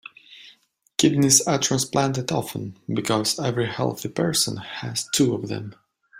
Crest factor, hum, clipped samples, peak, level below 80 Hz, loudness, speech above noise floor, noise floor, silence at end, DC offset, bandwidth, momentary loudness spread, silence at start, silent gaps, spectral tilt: 22 dB; none; under 0.1%; -2 dBFS; -60 dBFS; -22 LUFS; 36 dB; -58 dBFS; 0 s; under 0.1%; 16 kHz; 15 LU; 0.3 s; none; -3.5 dB/octave